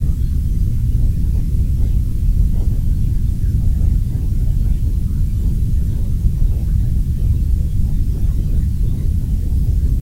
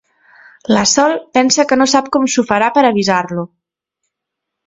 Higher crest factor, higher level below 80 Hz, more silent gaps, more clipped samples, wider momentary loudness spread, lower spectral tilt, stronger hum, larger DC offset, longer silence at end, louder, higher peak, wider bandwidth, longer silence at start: about the same, 12 dB vs 14 dB; first, -16 dBFS vs -54 dBFS; neither; neither; second, 2 LU vs 11 LU; first, -8.5 dB/octave vs -3 dB/octave; neither; neither; second, 0 s vs 1.2 s; second, -19 LUFS vs -13 LUFS; about the same, -2 dBFS vs 0 dBFS; first, 16 kHz vs 8 kHz; second, 0 s vs 0.7 s